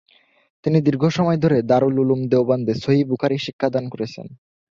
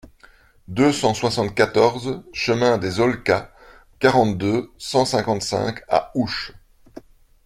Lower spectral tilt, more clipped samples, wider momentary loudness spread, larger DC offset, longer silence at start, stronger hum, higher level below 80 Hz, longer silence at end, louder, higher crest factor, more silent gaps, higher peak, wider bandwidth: first, -8 dB/octave vs -5 dB/octave; neither; first, 11 LU vs 8 LU; neither; about the same, 0.65 s vs 0.7 s; neither; second, -56 dBFS vs -50 dBFS; about the same, 0.35 s vs 0.45 s; about the same, -19 LUFS vs -20 LUFS; about the same, 16 dB vs 20 dB; first, 3.53-3.59 s vs none; about the same, -4 dBFS vs -2 dBFS; second, 7.4 kHz vs 15.5 kHz